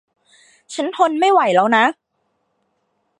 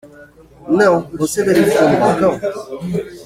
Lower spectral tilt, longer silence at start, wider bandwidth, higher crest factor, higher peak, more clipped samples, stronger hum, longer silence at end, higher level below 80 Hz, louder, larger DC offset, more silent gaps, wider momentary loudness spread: second, -4 dB/octave vs -5.5 dB/octave; first, 0.7 s vs 0.05 s; second, 11 kHz vs 16.5 kHz; about the same, 18 dB vs 16 dB; about the same, 0 dBFS vs 0 dBFS; neither; neither; first, 1.3 s vs 0 s; second, -76 dBFS vs -48 dBFS; about the same, -16 LUFS vs -15 LUFS; neither; neither; about the same, 12 LU vs 11 LU